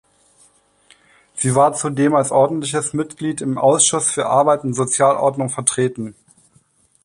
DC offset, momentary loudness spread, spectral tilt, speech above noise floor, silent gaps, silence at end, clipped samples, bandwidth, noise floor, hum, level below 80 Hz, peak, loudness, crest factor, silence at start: under 0.1%; 9 LU; -4 dB/octave; 40 dB; none; 0.95 s; under 0.1%; 11.5 kHz; -57 dBFS; none; -60 dBFS; 0 dBFS; -17 LUFS; 18 dB; 1.35 s